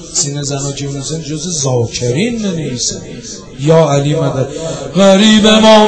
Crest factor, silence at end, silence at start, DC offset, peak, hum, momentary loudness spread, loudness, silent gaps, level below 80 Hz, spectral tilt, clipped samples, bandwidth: 12 dB; 0 s; 0 s; under 0.1%; 0 dBFS; none; 14 LU; -12 LUFS; none; -40 dBFS; -4.5 dB/octave; 0.9%; 11 kHz